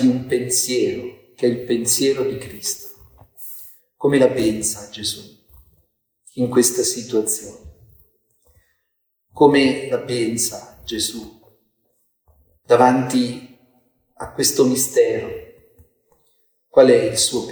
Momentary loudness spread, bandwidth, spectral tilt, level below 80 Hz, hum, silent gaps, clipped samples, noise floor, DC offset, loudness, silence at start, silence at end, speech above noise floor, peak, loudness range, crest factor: 19 LU; over 20 kHz; -3.5 dB/octave; -54 dBFS; none; none; under 0.1%; -73 dBFS; under 0.1%; -18 LUFS; 0 s; 0 s; 54 dB; 0 dBFS; 4 LU; 20 dB